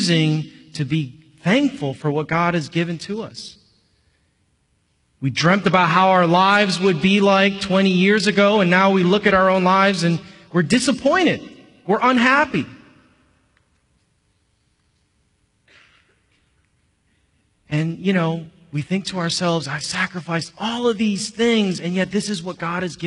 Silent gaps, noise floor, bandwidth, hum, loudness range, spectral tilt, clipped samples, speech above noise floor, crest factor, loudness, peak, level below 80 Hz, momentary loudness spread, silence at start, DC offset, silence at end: none; -65 dBFS; 11 kHz; none; 11 LU; -5 dB/octave; under 0.1%; 47 dB; 18 dB; -18 LUFS; -2 dBFS; -56 dBFS; 12 LU; 0 s; under 0.1%; 0 s